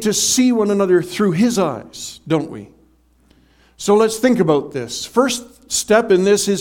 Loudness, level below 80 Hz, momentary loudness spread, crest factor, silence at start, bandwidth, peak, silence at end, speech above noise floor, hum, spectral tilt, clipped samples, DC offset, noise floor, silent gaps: -16 LUFS; -54 dBFS; 12 LU; 16 dB; 0 s; 17.5 kHz; 0 dBFS; 0 s; 38 dB; none; -4 dB/octave; under 0.1%; under 0.1%; -55 dBFS; none